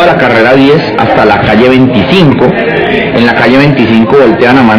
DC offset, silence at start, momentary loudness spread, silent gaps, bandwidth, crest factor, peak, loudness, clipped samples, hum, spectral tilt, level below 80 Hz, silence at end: under 0.1%; 0 s; 3 LU; none; 5.4 kHz; 4 dB; 0 dBFS; -5 LUFS; 20%; none; -8 dB/octave; -32 dBFS; 0 s